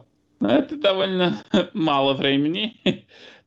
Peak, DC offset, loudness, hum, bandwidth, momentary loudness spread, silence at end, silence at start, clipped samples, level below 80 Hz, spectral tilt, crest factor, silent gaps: -8 dBFS; under 0.1%; -21 LUFS; none; 7.6 kHz; 6 LU; 0.15 s; 0.4 s; under 0.1%; -62 dBFS; -6.5 dB/octave; 14 dB; none